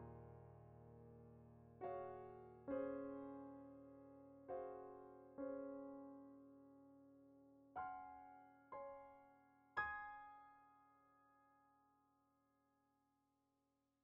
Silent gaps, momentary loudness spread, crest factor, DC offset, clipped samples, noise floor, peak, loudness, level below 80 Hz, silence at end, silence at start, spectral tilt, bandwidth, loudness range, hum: none; 19 LU; 24 dB; under 0.1%; under 0.1%; -87 dBFS; -32 dBFS; -54 LUFS; -80 dBFS; 2.1 s; 0 s; -1 dB/octave; 3.8 kHz; 5 LU; none